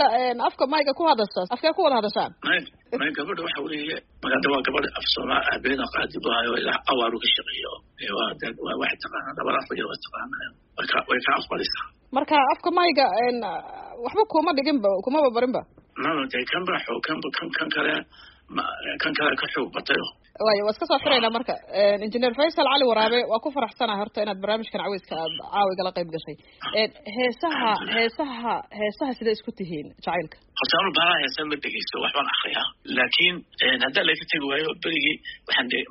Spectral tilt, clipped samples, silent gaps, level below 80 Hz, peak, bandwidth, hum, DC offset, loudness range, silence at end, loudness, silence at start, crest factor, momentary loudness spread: -0.5 dB/octave; under 0.1%; none; -58 dBFS; -6 dBFS; 5.8 kHz; none; under 0.1%; 5 LU; 0 s; -24 LUFS; 0 s; 20 dB; 11 LU